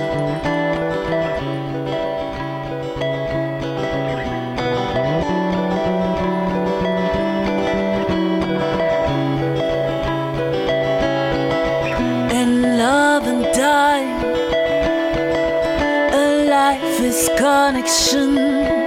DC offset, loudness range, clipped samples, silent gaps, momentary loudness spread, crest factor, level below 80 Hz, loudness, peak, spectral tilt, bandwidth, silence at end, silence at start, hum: under 0.1%; 6 LU; under 0.1%; none; 8 LU; 16 dB; -38 dBFS; -18 LUFS; -2 dBFS; -4.5 dB/octave; 16.5 kHz; 0 s; 0 s; none